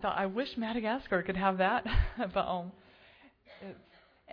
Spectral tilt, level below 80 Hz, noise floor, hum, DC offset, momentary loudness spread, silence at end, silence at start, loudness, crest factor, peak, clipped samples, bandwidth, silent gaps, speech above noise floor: -8 dB/octave; -40 dBFS; -61 dBFS; none; under 0.1%; 20 LU; 0 s; 0 s; -32 LUFS; 20 dB; -14 dBFS; under 0.1%; 5.4 kHz; none; 28 dB